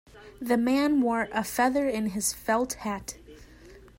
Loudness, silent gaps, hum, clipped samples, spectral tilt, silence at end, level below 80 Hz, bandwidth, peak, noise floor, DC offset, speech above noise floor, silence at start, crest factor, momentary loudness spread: -27 LUFS; none; 60 Hz at -55 dBFS; under 0.1%; -3.5 dB/octave; 0.2 s; -54 dBFS; 16.5 kHz; -12 dBFS; -50 dBFS; under 0.1%; 24 dB; 0.15 s; 16 dB; 13 LU